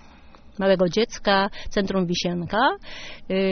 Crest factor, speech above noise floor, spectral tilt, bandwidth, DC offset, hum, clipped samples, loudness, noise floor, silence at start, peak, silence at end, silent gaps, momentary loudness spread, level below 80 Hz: 18 dB; 24 dB; -3.5 dB/octave; 6.6 kHz; under 0.1%; none; under 0.1%; -23 LUFS; -46 dBFS; 0.05 s; -6 dBFS; 0 s; none; 14 LU; -44 dBFS